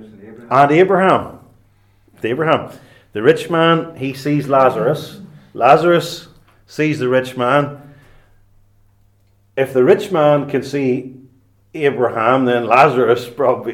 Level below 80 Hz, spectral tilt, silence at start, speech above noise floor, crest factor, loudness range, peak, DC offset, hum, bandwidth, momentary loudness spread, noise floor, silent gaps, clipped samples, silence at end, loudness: -58 dBFS; -6.5 dB/octave; 0 s; 41 dB; 16 dB; 4 LU; 0 dBFS; under 0.1%; none; 16 kHz; 15 LU; -55 dBFS; none; under 0.1%; 0 s; -15 LUFS